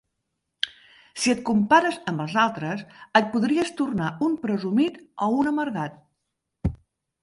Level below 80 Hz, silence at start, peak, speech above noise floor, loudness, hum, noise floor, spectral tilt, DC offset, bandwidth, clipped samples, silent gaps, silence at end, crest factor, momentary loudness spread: -48 dBFS; 0.65 s; -2 dBFS; 56 dB; -24 LUFS; none; -80 dBFS; -5 dB/octave; under 0.1%; 11.5 kHz; under 0.1%; none; 0.5 s; 22 dB; 12 LU